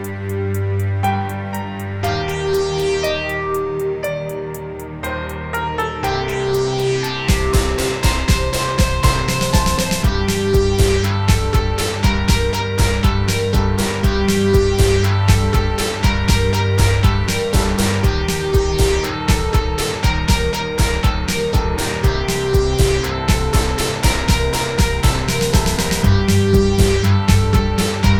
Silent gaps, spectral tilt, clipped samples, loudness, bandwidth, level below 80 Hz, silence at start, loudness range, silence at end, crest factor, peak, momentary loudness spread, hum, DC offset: none; -5 dB/octave; under 0.1%; -17 LUFS; 18.5 kHz; -22 dBFS; 0 s; 5 LU; 0 s; 16 dB; 0 dBFS; 7 LU; none; 0.7%